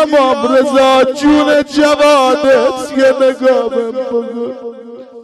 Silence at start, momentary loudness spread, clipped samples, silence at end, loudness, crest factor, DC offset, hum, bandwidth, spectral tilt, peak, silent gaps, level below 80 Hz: 0 s; 13 LU; under 0.1%; 0 s; -11 LUFS; 8 dB; under 0.1%; none; 13 kHz; -3.5 dB/octave; -2 dBFS; none; -46 dBFS